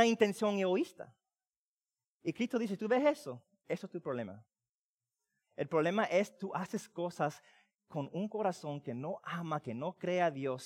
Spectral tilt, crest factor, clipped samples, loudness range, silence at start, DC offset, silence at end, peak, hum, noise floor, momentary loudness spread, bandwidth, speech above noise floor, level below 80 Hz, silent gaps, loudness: -5.5 dB/octave; 22 dB; under 0.1%; 4 LU; 0 s; under 0.1%; 0 s; -14 dBFS; none; under -90 dBFS; 12 LU; 16 kHz; over 55 dB; -84 dBFS; 1.56-1.77 s, 2.08-2.20 s, 4.69-4.99 s; -36 LUFS